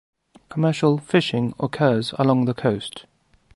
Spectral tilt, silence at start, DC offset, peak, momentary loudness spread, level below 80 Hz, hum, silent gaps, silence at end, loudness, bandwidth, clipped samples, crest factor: -7 dB/octave; 0.5 s; under 0.1%; -4 dBFS; 11 LU; -58 dBFS; none; none; 0.55 s; -21 LUFS; 11.5 kHz; under 0.1%; 18 dB